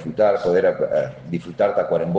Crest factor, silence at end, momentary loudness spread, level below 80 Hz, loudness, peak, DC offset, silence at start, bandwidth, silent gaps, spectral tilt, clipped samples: 14 dB; 0 s; 10 LU; -56 dBFS; -20 LUFS; -6 dBFS; under 0.1%; 0 s; 7.8 kHz; none; -8 dB/octave; under 0.1%